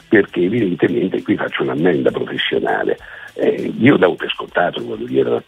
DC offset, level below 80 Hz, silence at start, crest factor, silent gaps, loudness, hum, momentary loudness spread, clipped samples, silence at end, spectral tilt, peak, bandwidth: under 0.1%; -54 dBFS; 0.1 s; 16 dB; none; -17 LUFS; none; 6 LU; under 0.1%; 0.05 s; -7.5 dB/octave; 0 dBFS; 9.6 kHz